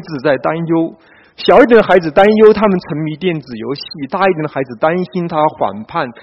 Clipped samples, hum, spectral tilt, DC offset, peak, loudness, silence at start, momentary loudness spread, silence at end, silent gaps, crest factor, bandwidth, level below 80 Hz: 0.4%; none; -8 dB/octave; under 0.1%; 0 dBFS; -13 LUFS; 0 s; 15 LU; 0.1 s; none; 12 dB; 6.2 kHz; -46 dBFS